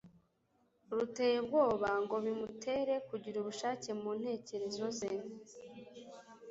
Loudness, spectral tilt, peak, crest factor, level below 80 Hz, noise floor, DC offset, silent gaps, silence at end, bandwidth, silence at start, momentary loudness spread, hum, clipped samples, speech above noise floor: -37 LUFS; -3.5 dB/octave; -20 dBFS; 18 dB; -74 dBFS; -76 dBFS; under 0.1%; none; 0 s; 8 kHz; 0.05 s; 21 LU; none; under 0.1%; 39 dB